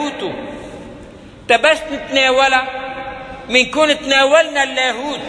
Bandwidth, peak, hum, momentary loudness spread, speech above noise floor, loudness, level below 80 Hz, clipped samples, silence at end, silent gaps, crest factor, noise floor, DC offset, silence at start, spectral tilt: 11 kHz; 0 dBFS; none; 19 LU; 23 dB; -14 LUFS; -46 dBFS; under 0.1%; 0 s; none; 16 dB; -37 dBFS; under 0.1%; 0 s; -2 dB/octave